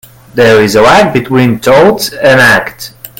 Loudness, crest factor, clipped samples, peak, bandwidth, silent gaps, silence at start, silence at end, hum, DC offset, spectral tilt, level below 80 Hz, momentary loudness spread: -6 LUFS; 8 dB; 2%; 0 dBFS; 17.5 kHz; none; 0.35 s; 0.15 s; none; under 0.1%; -5 dB/octave; -36 dBFS; 8 LU